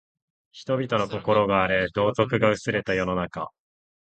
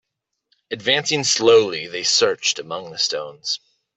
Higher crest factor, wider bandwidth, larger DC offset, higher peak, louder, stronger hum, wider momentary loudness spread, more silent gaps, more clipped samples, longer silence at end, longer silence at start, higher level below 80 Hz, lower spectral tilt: about the same, 20 dB vs 18 dB; about the same, 8.8 kHz vs 8.4 kHz; neither; about the same, -4 dBFS vs -2 dBFS; second, -24 LUFS vs -19 LUFS; neither; about the same, 11 LU vs 12 LU; neither; neither; first, 0.65 s vs 0.4 s; second, 0.55 s vs 0.7 s; first, -52 dBFS vs -66 dBFS; first, -6 dB/octave vs -1.5 dB/octave